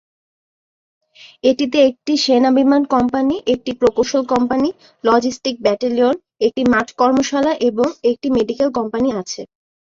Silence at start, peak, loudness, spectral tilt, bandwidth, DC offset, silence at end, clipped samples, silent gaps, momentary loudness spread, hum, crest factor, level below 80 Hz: 1.25 s; -2 dBFS; -17 LUFS; -4.5 dB/octave; 7.6 kHz; under 0.1%; 0.45 s; under 0.1%; none; 6 LU; none; 16 dB; -52 dBFS